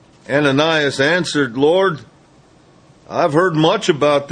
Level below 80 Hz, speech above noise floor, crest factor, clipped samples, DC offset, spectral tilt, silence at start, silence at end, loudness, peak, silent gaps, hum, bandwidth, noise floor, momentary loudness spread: -56 dBFS; 34 dB; 16 dB; under 0.1%; under 0.1%; -5 dB/octave; 0.3 s; 0 s; -16 LUFS; 0 dBFS; none; none; 10 kHz; -49 dBFS; 5 LU